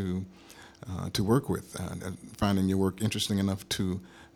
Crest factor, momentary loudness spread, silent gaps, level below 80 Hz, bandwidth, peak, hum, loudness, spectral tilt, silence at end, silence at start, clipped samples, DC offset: 20 dB; 14 LU; none; -54 dBFS; 17 kHz; -10 dBFS; none; -30 LUFS; -5.5 dB/octave; 0.1 s; 0 s; under 0.1%; under 0.1%